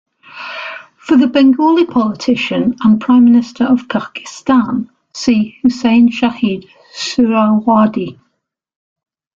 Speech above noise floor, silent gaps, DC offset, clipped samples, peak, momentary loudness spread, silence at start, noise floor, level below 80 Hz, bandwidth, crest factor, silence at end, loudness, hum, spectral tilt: 57 dB; none; under 0.1%; under 0.1%; -2 dBFS; 16 LU; 0.35 s; -69 dBFS; -52 dBFS; 7.6 kHz; 12 dB; 1.25 s; -13 LUFS; none; -5.5 dB/octave